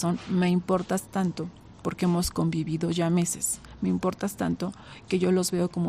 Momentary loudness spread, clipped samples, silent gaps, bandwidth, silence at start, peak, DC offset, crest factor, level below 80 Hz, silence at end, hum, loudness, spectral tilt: 9 LU; under 0.1%; none; 15.5 kHz; 0 s; -12 dBFS; under 0.1%; 14 dB; -50 dBFS; 0 s; none; -27 LUFS; -5.5 dB/octave